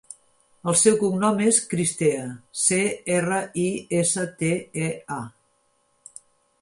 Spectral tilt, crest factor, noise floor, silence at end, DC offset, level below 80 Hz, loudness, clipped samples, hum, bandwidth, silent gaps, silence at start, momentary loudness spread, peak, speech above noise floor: -4 dB/octave; 20 dB; -67 dBFS; 1.3 s; under 0.1%; -64 dBFS; -22 LUFS; under 0.1%; none; 11.5 kHz; none; 0.1 s; 14 LU; -6 dBFS; 44 dB